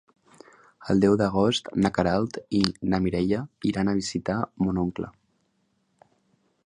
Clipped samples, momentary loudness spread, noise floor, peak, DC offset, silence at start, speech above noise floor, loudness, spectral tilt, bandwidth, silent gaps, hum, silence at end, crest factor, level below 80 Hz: under 0.1%; 8 LU; -71 dBFS; -4 dBFS; under 0.1%; 0.8 s; 47 dB; -25 LUFS; -6 dB/octave; 10.5 kHz; none; none; 1.55 s; 22 dB; -50 dBFS